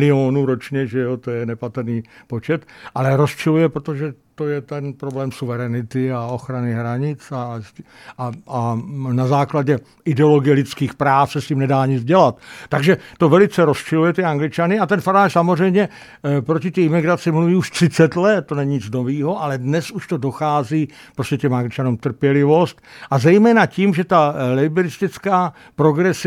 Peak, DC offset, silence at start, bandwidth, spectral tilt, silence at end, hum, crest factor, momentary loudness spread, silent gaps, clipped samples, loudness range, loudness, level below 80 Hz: 0 dBFS; under 0.1%; 0 s; 14 kHz; -7 dB/octave; 0 s; none; 16 dB; 11 LU; none; under 0.1%; 8 LU; -18 LUFS; -58 dBFS